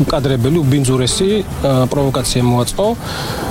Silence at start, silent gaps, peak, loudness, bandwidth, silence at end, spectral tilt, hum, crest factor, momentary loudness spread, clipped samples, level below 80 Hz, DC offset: 0 s; none; -2 dBFS; -15 LUFS; 16.5 kHz; 0 s; -5.5 dB/octave; none; 12 dB; 4 LU; under 0.1%; -30 dBFS; under 0.1%